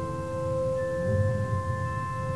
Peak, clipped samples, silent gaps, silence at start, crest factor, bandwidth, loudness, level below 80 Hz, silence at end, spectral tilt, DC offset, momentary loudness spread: -16 dBFS; under 0.1%; none; 0 s; 14 dB; 11 kHz; -29 LUFS; -46 dBFS; 0 s; -8 dB/octave; 0.4%; 5 LU